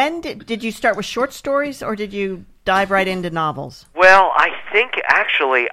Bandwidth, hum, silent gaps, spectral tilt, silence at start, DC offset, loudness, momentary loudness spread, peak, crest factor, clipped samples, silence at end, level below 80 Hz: 15 kHz; none; none; -4 dB/octave; 0 s; under 0.1%; -17 LUFS; 15 LU; 0 dBFS; 18 dB; under 0.1%; 0 s; -48 dBFS